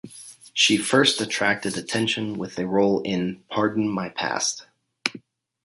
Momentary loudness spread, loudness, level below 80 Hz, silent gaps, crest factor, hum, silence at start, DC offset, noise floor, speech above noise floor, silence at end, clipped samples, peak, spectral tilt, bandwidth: 11 LU; -23 LUFS; -62 dBFS; none; 24 dB; none; 0.05 s; under 0.1%; -46 dBFS; 23 dB; 0.45 s; under 0.1%; 0 dBFS; -3 dB/octave; 11.5 kHz